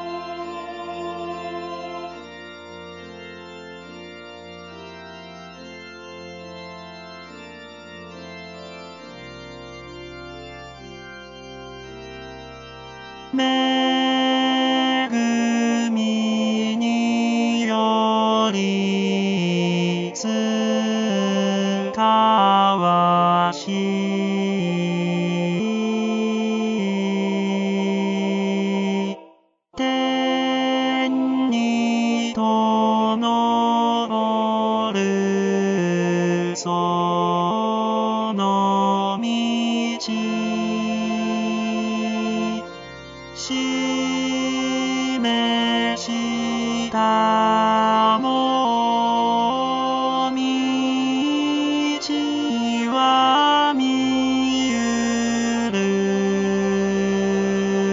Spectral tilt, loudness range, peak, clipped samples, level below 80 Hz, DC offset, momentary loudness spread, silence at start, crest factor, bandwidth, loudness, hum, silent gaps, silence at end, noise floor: -5 dB/octave; 19 LU; -6 dBFS; under 0.1%; -58 dBFS; under 0.1%; 20 LU; 0 s; 16 dB; 7.6 kHz; -20 LUFS; none; none; 0 s; -53 dBFS